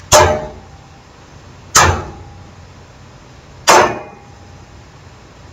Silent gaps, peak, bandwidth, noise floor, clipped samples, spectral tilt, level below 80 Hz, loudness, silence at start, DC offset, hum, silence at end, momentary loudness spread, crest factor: none; 0 dBFS; over 20 kHz; -40 dBFS; 0.2%; -2.5 dB/octave; -36 dBFS; -12 LUFS; 0.1 s; under 0.1%; none; 1.45 s; 22 LU; 18 dB